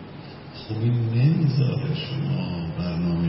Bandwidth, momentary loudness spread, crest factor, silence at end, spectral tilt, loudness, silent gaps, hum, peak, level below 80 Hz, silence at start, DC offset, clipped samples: 5.8 kHz; 19 LU; 14 dB; 0 s; -11.5 dB/octave; -24 LUFS; none; none; -10 dBFS; -48 dBFS; 0 s; under 0.1%; under 0.1%